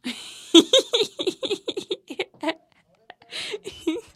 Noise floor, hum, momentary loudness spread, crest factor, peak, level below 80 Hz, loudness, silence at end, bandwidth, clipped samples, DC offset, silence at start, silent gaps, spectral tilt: -61 dBFS; none; 17 LU; 24 dB; 0 dBFS; -66 dBFS; -23 LUFS; 0.15 s; 14 kHz; under 0.1%; under 0.1%; 0.05 s; none; -2 dB/octave